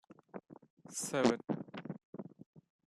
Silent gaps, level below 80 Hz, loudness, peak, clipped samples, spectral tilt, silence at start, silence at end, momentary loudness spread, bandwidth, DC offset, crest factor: 0.70-0.77 s, 2.05-2.13 s, 2.46-2.53 s; -78 dBFS; -37 LUFS; -14 dBFS; under 0.1%; -4.5 dB/octave; 0.1 s; 0.3 s; 21 LU; 13.5 kHz; under 0.1%; 26 dB